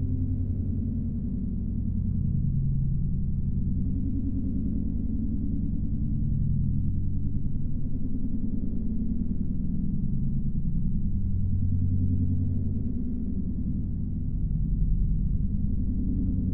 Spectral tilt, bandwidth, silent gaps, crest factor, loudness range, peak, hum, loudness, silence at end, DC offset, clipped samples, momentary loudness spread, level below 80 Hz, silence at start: -16 dB/octave; 0.9 kHz; none; 12 dB; 2 LU; -14 dBFS; none; -30 LUFS; 0 s; 0.9%; under 0.1%; 4 LU; -30 dBFS; 0 s